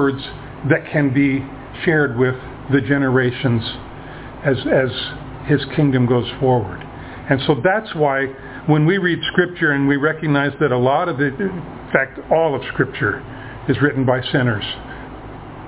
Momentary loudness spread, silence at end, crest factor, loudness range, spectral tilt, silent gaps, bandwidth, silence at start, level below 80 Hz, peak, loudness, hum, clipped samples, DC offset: 14 LU; 0 s; 18 dB; 2 LU; -10.5 dB/octave; none; 4 kHz; 0 s; -44 dBFS; 0 dBFS; -18 LUFS; none; under 0.1%; under 0.1%